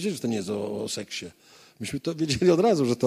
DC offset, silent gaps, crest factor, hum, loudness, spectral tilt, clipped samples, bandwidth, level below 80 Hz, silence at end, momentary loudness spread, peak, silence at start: under 0.1%; none; 18 dB; none; -26 LUFS; -5.5 dB/octave; under 0.1%; 15.5 kHz; -56 dBFS; 0 s; 15 LU; -8 dBFS; 0 s